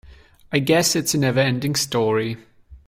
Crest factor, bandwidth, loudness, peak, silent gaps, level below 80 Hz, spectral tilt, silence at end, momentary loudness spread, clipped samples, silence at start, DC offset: 16 dB; 16.5 kHz; -20 LUFS; -4 dBFS; none; -52 dBFS; -4 dB/octave; 0.1 s; 7 LU; under 0.1%; 0.05 s; under 0.1%